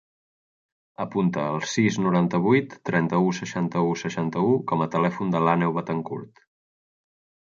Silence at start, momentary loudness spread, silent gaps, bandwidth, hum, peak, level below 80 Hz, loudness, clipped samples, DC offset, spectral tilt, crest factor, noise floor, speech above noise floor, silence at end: 1 s; 8 LU; none; 7.6 kHz; none; -6 dBFS; -64 dBFS; -24 LUFS; under 0.1%; under 0.1%; -6.5 dB/octave; 18 dB; under -90 dBFS; over 67 dB; 1.3 s